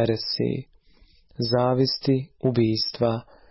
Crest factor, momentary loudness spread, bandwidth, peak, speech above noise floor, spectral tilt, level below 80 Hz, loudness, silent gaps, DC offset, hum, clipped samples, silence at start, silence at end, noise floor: 16 dB; 7 LU; 6 kHz; -10 dBFS; 32 dB; -9 dB/octave; -54 dBFS; -24 LUFS; none; under 0.1%; none; under 0.1%; 0 s; 0.3 s; -56 dBFS